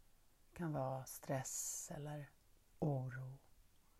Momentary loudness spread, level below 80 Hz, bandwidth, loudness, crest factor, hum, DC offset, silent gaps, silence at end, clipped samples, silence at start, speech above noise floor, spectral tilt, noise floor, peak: 14 LU; -70 dBFS; 15.5 kHz; -45 LUFS; 18 dB; none; under 0.1%; none; 0.2 s; under 0.1%; 0.25 s; 25 dB; -5 dB/octave; -69 dBFS; -28 dBFS